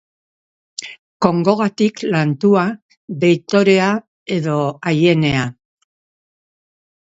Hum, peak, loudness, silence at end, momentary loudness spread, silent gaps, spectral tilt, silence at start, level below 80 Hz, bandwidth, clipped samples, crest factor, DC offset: none; 0 dBFS; -16 LUFS; 1.65 s; 17 LU; 0.99-1.20 s, 2.82-2.89 s, 2.97-3.08 s, 4.07-4.26 s; -6.5 dB/octave; 0.8 s; -54 dBFS; 8 kHz; under 0.1%; 18 dB; under 0.1%